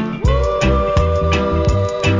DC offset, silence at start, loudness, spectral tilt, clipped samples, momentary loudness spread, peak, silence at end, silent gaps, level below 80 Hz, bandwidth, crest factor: under 0.1%; 0 s; -16 LUFS; -6.5 dB/octave; under 0.1%; 2 LU; -2 dBFS; 0 s; none; -20 dBFS; 7.6 kHz; 14 dB